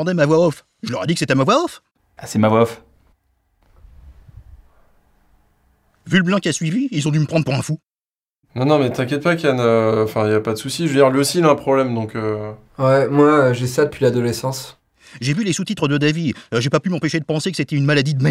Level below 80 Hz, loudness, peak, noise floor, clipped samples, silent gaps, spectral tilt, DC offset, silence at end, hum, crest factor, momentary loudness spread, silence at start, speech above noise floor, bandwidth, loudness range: -54 dBFS; -18 LUFS; 0 dBFS; under -90 dBFS; under 0.1%; 8.21-8.26 s; -6 dB/octave; under 0.1%; 0 s; none; 18 dB; 10 LU; 0 s; over 73 dB; 16 kHz; 7 LU